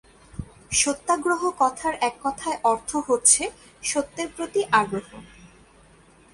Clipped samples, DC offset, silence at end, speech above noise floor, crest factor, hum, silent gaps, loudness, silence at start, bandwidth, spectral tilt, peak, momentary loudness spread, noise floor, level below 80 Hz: under 0.1%; under 0.1%; 1.1 s; 30 dB; 22 dB; none; none; -23 LUFS; 0.4 s; 11.5 kHz; -2 dB/octave; -2 dBFS; 15 LU; -54 dBFS; -54 dBFS